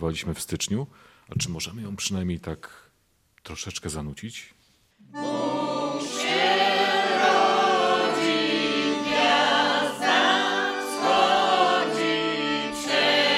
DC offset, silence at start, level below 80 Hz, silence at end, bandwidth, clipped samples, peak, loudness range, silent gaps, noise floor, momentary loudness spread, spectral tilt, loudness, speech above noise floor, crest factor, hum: under 0.1%; 0 s; -56 dBFS; 0 s; 16 kHz; under 0.1%; -6 dBFS; 12 LU; none; -66 dBFS; 14 LU; -3.5 dB/octave; -23 LUFS; 35 dB; 18 dB; none